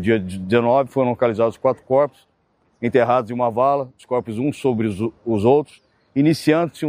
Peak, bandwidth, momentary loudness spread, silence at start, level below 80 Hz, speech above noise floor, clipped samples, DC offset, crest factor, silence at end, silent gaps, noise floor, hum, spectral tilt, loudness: -2 dBFS; 15.5 kHz; 8 LU; 0 s; -58 dBFS; 45 dB; under 0.1%; under 0.1%; 18 dB; 0 s; none; -63 dBFS; none; -7.5 dB/octave; -20 LUFS